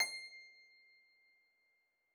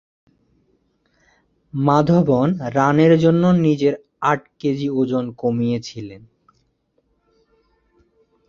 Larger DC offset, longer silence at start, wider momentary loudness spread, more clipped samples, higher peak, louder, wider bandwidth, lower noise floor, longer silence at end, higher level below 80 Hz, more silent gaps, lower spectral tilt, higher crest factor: neither; second, 0 s vs 1.75 s; first, 24 LU vs 11 LU; neither; second, -22 dBFS vs -2 dBFS; second, -44 LUFS vs -18 LUFS; first, 18 kHz vs 7.2 kHz; first, -80 dBFS vs -66 dBFS; second, 1.5 s vs 2.3 s; second, under -90 dBFS vs -56 dBFS; neither; second, 4 dB/octave vs -8 dB/octave; first, 26 dB vs 18 dB